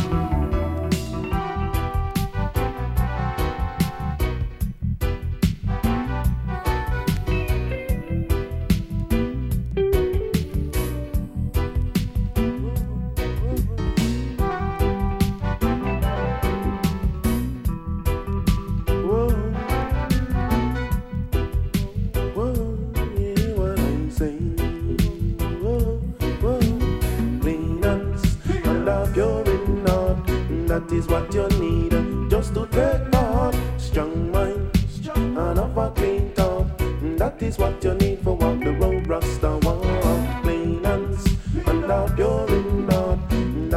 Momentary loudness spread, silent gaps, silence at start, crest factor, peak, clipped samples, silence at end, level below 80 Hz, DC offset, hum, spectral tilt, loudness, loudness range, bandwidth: 5 LU; none; 0 s; 20 dB; -2 dBFS; under 0.1%; 0 s; -26 dBFS; under 0.1%; none; -7 dB/octave; -23 LUFS; 3 LU; 16 kHz